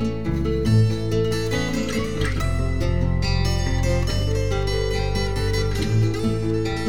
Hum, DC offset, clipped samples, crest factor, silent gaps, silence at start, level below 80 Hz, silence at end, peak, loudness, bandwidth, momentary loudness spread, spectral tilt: none; 2%; under 0.1%; 14 dB; none; 0 s; -28 dBFS; 0 s; -8 dBFS; -23 LUFS; 17 kHz; 4 LU; -6 dB/octave